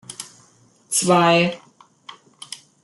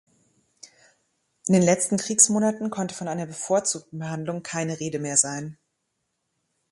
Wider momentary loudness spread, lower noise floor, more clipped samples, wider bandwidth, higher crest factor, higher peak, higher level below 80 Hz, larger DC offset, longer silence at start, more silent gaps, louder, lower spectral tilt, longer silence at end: first, 24 LU vs 14 LU; second, -55 dBFS vs -77 dBFS; neither; about the same, 12.5 kHz vs 11.5 kHz; second, 18 dB vs 24 dB; about the same, -4 dBFS vs -4 dBFS; about the same, -66 dBFS vs -68 dBFS; neither; second, 0.1 s vs 0.65 s; neither; first, -17 LUFS vs -23 LUFS; about the same, -3.5 dB/octave vs -4 dB/octave; second, 0.3 s vs 1.2 s